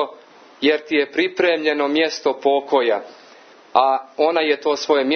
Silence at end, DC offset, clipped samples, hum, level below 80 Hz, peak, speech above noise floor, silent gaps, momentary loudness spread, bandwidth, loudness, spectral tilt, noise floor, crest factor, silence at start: 0 s; under 0.1%; under 0.1%; none; -74 dBFS; 0 dBFS; 28 dB; none; 4 LU; 6.6 kHz; -19 LUFS; -3 dB/octave; -46 dBFS; 20 dB; 0 s